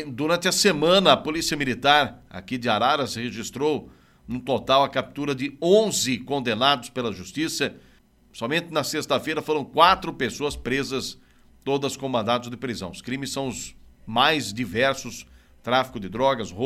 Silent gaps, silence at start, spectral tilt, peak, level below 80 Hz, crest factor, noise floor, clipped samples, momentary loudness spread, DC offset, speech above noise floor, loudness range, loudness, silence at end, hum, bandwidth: none; 0 s; -3.5 dB/octave; -2 dBFS; -52 dBFS; 22 dB; -56 dBFS; under 0.1%; 13 LU; under 0.1%; 33 dB; 5 LU; -23 LUFS; 0 s; none; 16 kHz